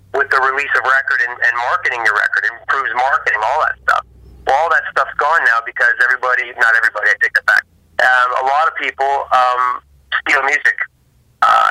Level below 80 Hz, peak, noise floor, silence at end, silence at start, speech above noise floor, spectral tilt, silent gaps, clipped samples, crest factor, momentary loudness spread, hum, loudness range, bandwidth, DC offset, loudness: -52 dBFS; -2 dBFS; -54 dBFS; 0 s; 0.15 s; 39 dB; -1.5 dB/octave; none; under 0.1%; 12 dB; 6 LU; none; 2 LU; 16 kHz; under 0.1%; -14 LUFS